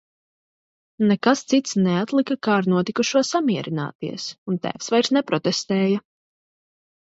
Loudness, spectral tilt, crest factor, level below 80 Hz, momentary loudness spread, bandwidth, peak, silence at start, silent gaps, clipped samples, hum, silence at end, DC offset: -22 LUFS; -5 dB/octave; 20 dB; -68 dBFS; 8 LU; 8 kHz; -4 dBFS; 1 s; 3.95-3.99 s, 4.38-4.46 s; under 0.1%; none; 1.2 s; under 0.1%